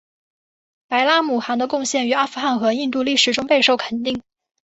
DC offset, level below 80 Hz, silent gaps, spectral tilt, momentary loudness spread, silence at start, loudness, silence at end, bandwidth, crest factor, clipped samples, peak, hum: under 0.1%; -62 dBFS; none; -2 dB/octave; 8 LU; 0.9 s; -18 LUFS; 0.45 s; 8.2 kHz; 18 dB; under 0.1%; -2 dBFS; none